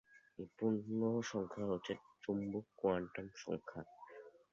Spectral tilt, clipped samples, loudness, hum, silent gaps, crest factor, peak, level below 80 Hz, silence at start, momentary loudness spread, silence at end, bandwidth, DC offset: -6 dB/octave; under 0.1%; -41 LUFS; none; none; 18 dB; -24 dBFS; -72 dBFS; 0.15 s; 18 LU; 0.25 s; 7.4 kHz; under 0.1%